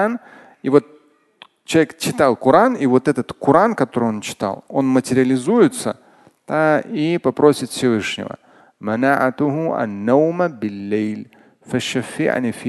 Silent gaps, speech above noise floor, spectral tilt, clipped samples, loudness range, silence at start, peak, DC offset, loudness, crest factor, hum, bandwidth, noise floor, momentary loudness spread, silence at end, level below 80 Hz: none; 31 dB; -5.5 dB/octave; under 0.1%; 3 LU; 0 s; 0 dBFS; under 0.1%; -18 LUFS; 18 dB; none; 12.5 kHz; -49 dBFS; 11 LU; 0 s; -58 dBFS